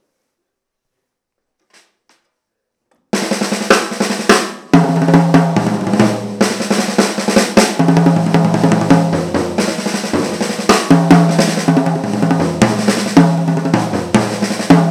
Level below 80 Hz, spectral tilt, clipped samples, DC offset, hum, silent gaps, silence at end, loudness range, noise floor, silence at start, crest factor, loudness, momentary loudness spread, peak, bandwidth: -46 dBFS; -5.5 dB/octave; 0.3%; under 0.1%; none; none; 0 s; 5 LU; -76 dBFS; 3.15 s; 14 dB; -13 LUFS; 7 LU; 0 dBFS; 14.5 kHz